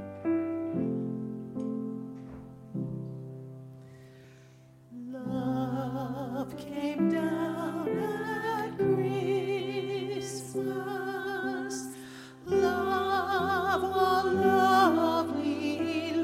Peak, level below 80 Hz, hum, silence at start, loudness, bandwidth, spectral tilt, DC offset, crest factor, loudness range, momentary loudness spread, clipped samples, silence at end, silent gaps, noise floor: -12 dBFS; -66 dBFS; none; 0 s; -30 LUFS; 16 kHz; -6 dB/octave; under 0.1%; 18 dB; 13 LU; 17 LU; under 0.1%; 0 s; none; -55 dBFS